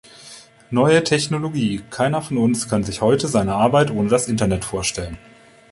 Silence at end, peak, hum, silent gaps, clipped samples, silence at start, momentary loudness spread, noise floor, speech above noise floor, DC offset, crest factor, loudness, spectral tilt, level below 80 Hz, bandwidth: 0.55 s; -2 dBFS; none; none; under 0.1%; 0.2 s; 14 LU; -43 dBFS; 25 dB; under 0.1%; 18 dB; -19 LUFS; -5 dB/octave; -44 dBFS; 11.5 kHz